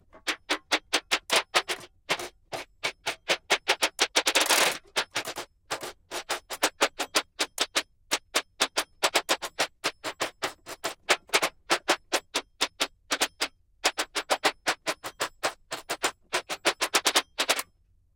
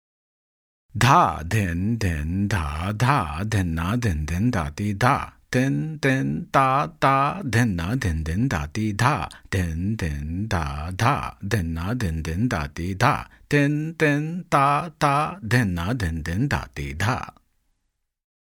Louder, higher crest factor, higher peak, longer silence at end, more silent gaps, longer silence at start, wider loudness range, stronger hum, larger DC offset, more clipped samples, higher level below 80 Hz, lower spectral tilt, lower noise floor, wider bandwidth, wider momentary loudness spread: second, -28 LUFS vs -23 LUFS; about the same, 24 dB vs 20 dB; second, -6 dBFS vs -2 dBFS; second, 0.5 s vs 1.25 s; neither; second, 0.15 s vs 0.95 s; about the same, 3 LU vs 3 LU; neither; neither; neither; second, -64 dBFS vs -40 dBFS; second, 0.5 dB/octave vs -6 dB/octave; second, -64 dBFS vs -75 dBFS; about the same, 17 kHz vs 17.5 kHz; first, 11 LU vs 7 LU